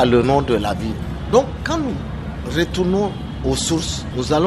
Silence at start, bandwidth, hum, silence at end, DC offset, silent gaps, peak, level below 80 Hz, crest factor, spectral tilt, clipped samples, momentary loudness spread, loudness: 0 s; 13.5 kHz; none; 0 s; under 0.1%; none; -2 dBFS; -32 dBFS; 16 dB; -5.5 dB/octave; under 0.1%; 9 LU; -20 LUFS